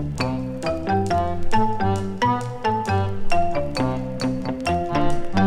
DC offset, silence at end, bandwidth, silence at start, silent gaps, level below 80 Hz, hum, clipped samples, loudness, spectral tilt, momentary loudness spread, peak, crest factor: under 0.1%; 0 s; 10.5 kHz; 0 s; none; -32 dBFS; none; under 0.1%; -23 LUFS; -6.5 dB/octave; 4 LU; -6 dBFS; 14 dB